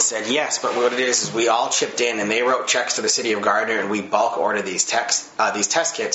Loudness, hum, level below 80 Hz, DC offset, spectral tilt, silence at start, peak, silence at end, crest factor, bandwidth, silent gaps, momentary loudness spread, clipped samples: -20 LUFS; none; -72 dBFS; under 0.1%; -1 dB/octave; 0 s; -4 dBFS; 0 s; 18 dB; 8.2 kHz; none; 3 LU; under 0.1%